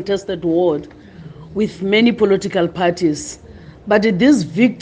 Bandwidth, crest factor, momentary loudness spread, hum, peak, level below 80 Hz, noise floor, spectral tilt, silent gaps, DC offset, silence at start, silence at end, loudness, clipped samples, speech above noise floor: 9.8 kHz; 16 dB; 15 LU; none; -2 dBFS; -48 dBFS; -37 dBFS; -5.5 dB/octave; none; under 0.1%; 0 s; 0 s; -16 LUFS; under 0.1%; 21 dB